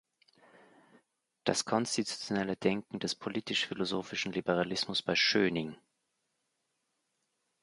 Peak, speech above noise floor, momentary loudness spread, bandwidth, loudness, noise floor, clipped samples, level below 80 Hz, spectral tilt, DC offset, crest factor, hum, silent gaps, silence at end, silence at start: -12 dBFS; 49 dB; 9 LU; 11.5 kHz; -32 LUFS; -81 dBFS; under 0.1%; -70 dBFS; -3.5 dB/octave; under 0.1%; 22 dB; none; none; 1.9 s; 1.45 s